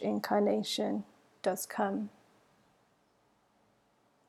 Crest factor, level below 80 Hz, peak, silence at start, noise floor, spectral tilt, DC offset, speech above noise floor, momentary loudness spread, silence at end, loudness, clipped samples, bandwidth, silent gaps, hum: 20 dB; -82 dBFS; -16 dBFS; 0 s; -71 dBFS; -4.5 dB/octave; under 0.1%; 39 dB; 10 LU; 2.2 s; -33 LUFS; under 0.1%; 16.5 kHz; none; none